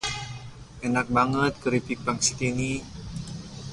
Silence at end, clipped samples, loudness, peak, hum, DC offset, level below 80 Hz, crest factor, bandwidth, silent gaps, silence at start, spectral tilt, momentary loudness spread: 0 s; under 0.1%; -26 LUFS; -8 dBFS; none; under 0.1%; -48 dBFS; 20 dB; 11.5 kHz; none; 0 s; -4 dB/octave; 15 LU